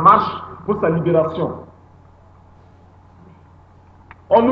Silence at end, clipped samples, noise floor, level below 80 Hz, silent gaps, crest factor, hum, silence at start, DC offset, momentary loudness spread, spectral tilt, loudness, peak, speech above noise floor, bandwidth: 0 s; under 0.1%; -47 dBFS; -52 dBFS; none; 20 dB; none; 0 s; under 0.1%; 12 LU; -9.5 dB/octave; -18 LUFS; 0 dBFS; 29 dB; 6 kHz